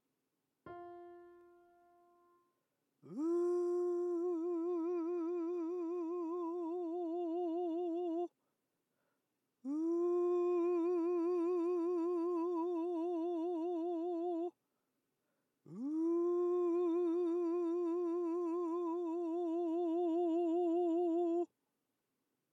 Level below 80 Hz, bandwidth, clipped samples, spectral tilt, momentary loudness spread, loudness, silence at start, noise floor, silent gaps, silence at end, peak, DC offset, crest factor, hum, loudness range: under -90 dBFS; 6 kHz; under 0.1%; -7.5 dB/octave; 7 LU; -37 LUFS; 0.65 s; -86 dBFS; none; 1.1 s; -28 dBFS; under 0.1%; 10 dB; none; 5 LU